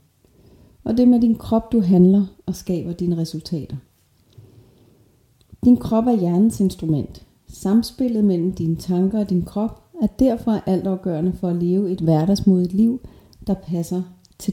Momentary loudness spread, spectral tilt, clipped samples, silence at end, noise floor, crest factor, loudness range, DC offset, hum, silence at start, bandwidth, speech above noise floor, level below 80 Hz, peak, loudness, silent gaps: 12 LU; -8.5 dB/octave; under 0.1%; 0 s; -57 dBFS; 16 dB; 4 LU; under 0.1%; none; 0.85 s; 15.5 kHz; 38 dB; -44 dBFS; -4 dBFS; -20 LUFS; none